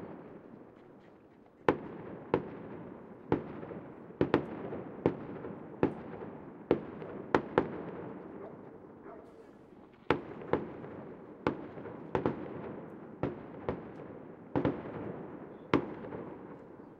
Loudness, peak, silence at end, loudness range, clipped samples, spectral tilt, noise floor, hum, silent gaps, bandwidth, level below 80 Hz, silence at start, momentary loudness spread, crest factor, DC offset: -37 LUFS; -8 dBFS; 0 s; 4 LU; under 0.1%; -8.5 dB/octave; -59 dBFS; none; none; 7.6 kHz; -62 dBFS; 0 s; 18 LU; 30 dB; under 0.1%